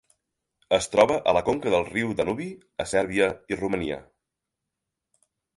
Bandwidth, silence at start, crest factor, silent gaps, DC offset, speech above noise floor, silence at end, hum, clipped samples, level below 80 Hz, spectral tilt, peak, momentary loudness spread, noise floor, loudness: 11.5 kHz; 0.7 s; 22 dB; none; under 0.1%; 60 dB; 1.55 s; none; under 0.1%; -54 dBFS; -4.5 dB/octave; -4 dBFS; 12 LU; -85 dBFS; -25 LUFS